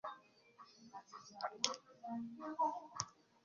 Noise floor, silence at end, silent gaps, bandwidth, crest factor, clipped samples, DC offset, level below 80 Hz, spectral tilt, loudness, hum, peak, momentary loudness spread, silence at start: -65 dBFS; 0.3 s; none; 7.2 kHz; 34 dB; under 0.1%; under 0.1%; -84 dBFS; -1.5 dB/octave; -43 LUFS; none; -12 dBFS; 20 LU; 0.05 s